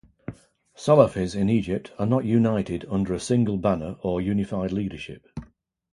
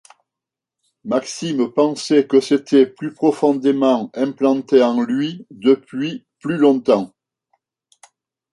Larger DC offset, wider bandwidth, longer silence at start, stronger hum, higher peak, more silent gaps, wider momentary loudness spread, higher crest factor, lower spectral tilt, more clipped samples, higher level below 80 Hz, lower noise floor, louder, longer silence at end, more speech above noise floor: neither; about the same, 11.5 kHz vs 11.5 kHz; second, 0.3 s vs 1.05 s; neither; about the same, -2 dBFS vs -2 dBFS; neither; first, 20 LU vs 10 LU; first, 22 dB vs 16 dB; first, -7.5 dB/octave vs -5.5 dB/octave; neither; first, -48 dBFS vs -68 dBFS; second, -50 dBFS vs -86 dBFS; second, -24 LUFS vs -18 LUFS; second, 0.5 s vs 1.45 s; second, 27 dB vs 69 dB